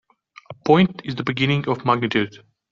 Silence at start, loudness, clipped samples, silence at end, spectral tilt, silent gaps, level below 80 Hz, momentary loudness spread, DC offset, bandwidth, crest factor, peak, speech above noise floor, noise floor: 0.5 s; -20 LUFS; under 0.1%; 0.35 s; -7 dB/octave; none; -56 dBFS; 10 LU; under 0.1%; 7.2 kHz; 18 dB; -4 dBFS; 23 dB; -43 dBFS